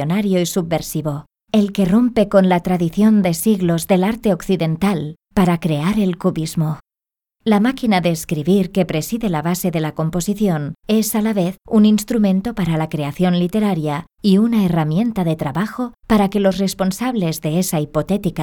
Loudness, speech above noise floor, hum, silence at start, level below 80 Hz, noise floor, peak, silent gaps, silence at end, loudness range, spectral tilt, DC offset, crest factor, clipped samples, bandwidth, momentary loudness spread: -18 LUFS; 72 dB; none; 0 s; -44 dBFS; -89 dBFS; -2 dBFS; none; 0 s; 3 LU; -6.5 dB/octave; under 0.1%; 16 dB; under 0.1%; 19 kHz; 7 LU